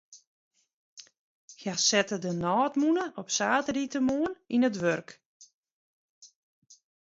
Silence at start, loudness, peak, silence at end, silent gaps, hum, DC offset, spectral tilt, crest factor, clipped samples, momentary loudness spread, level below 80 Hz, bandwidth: 0.1 s; -28 LUFS; -10 dBFS; 0.85 s; 0.27-0.51 s, 0.73-0.97 s, 1.19-1.48 s, 5.26-5.40 s, 5.54-5.63 s, 5.72-6.21 s; none; under 0.1%; -3.5 dB/octave; 20 dB; under 0.1%; 7 LU; -68 dBFS; 7.8 kHz